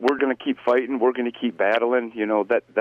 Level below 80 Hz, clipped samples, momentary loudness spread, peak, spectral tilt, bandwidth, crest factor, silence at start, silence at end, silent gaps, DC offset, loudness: -70 dBFS; under 0.1%; 4 LU; -8 dBFS; -6 dB/octave; 7.6 kHz; 12 dB; 0 s; 0 s; none; under 0.1%; -22 LUFS